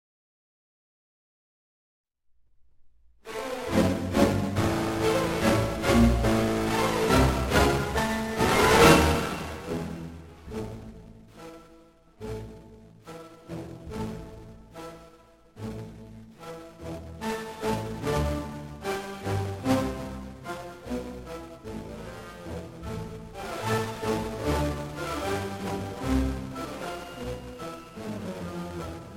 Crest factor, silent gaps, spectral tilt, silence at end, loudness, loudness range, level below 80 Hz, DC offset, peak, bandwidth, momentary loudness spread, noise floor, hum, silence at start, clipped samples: 24 dB; none; -5 dB/octave; 0 s; -27 LUFS; 18 LU; -40 dBFS; under 0.1%; -4 dBFS; 17.5 kHz; 21 LU; -62 dBFS; none; 2.8 s; under 0.1%